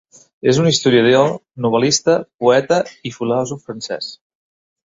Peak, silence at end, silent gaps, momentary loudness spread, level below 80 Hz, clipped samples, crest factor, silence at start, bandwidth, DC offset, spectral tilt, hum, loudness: -2 dBFS; 0.8 s; 2.34-2.39 s; 14 LU; -56 dBFS; under 0.1%; 16 dB; 0.45 s; 7.8 kHz; under 0.1%; -4.5 dB/octave; none; -16 LUFS